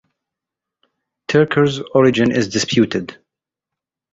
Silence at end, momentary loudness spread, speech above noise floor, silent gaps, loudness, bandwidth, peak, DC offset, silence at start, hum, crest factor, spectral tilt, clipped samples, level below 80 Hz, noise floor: 1 s; 11 LU; 70 dB; none; -16 LUFS; 8 kHz; -2 dBFS; under 0.1%; 1.3 s; none; 16 dB; -5.5 dB/octave; under 0.1%; -52 dBFS; -85 dBFS